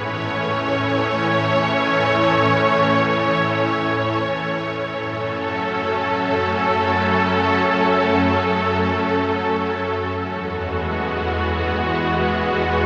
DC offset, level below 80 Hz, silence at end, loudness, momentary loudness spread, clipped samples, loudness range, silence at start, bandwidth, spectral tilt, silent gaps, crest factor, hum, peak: under 0.1%; -40 dBFS; 0 s; -20 LUFS; 7 LU; under 0.1%; 4 LU; 0 s; 8.2 kHz; -6.5 dB/octave; none; 14 dB; none; -6 dBFS